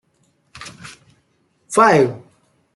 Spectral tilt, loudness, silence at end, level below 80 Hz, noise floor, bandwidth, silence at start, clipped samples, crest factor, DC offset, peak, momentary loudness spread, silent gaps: -5 dB/octave; -15 LUFS; 0.55 s; -60 dBFS; -63 dBFS; 12 kHz; 0.55 s; under 0.1%; 20 dB; under 0.1%; -2 dBFS; 26 LU; none